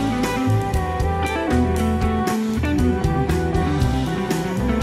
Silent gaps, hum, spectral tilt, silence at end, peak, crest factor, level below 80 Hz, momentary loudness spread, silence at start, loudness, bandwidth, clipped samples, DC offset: none; none; -6.5 dB/octave; 0 s; -8 dBFS; 12 dB; -28 dBFS; 3 LU; 0 s; -21 LUFS; 15.5 kHz; under 0.1%; under 0.1%